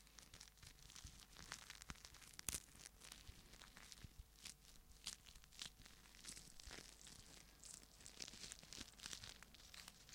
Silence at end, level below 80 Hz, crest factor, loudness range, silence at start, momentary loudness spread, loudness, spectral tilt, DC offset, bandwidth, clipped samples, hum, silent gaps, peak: 0 s; -68 dBFS; 40 dB; 3 LU; 0 s; 9 LU; -57 LUFS; -1 dB/octave; under 0.1%; 16.5 kHz; under 0.1%; none; none; -20 dBFS